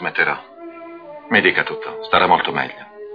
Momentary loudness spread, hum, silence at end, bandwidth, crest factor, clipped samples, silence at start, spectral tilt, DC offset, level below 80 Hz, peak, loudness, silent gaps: 22 LU; none; 0 s; 5.2 kHz; 20 dB; under 0.1%; 0 s; -6.5 dB/octave; under 0.1%; -58 dBFS; 0 dBFS; -18 LUFS; none